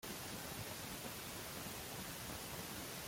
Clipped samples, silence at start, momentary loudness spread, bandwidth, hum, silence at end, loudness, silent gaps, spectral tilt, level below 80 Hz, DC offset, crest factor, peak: under 0.1%; 0 s; 0 LU; 16.5 kHz; none; 0 s; -46 LUFS; none; -3 dB/octave; -64 dBFS; under 0.1%; 14 dB; -32 dBFS